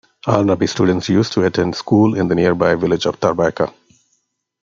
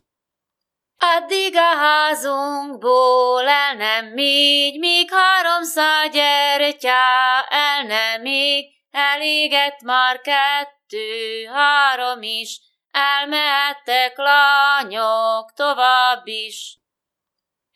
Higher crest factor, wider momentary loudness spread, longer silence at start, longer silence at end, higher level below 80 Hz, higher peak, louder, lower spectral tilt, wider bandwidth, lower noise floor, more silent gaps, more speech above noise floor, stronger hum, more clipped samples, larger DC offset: about the same, 16 dB vs 18 dB; second, 4 LU vs 11 LU; second, 0.25 s vs 1 s; about the same, 0.95 s vs 1.05 s; first, -50 dBFS vs under -90 dBFS; about the same, -2 dBFS vs 0 dBFS; about the same, -16 LUFS vs -16 LUFS; first, -6.5 dB/octave vs 0.5 dB/octave; second, 7.6 kHz vs 16 kHz; second, -67 dBFS vs -84 dBFS; neither; second, 52 dB vs 66 dB; neither; neither; neither